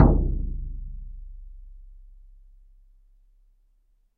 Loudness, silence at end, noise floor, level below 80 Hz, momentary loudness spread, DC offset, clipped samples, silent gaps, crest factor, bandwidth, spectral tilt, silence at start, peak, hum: -28 LUFS; 2.25 s; -64 dBFS; -30 dBFS; 26 LU; under 0.1%; under 0.1%; none; 26 dB; 2 kHz; -13.5 dB/octave; 0 s; -2 dBFS; none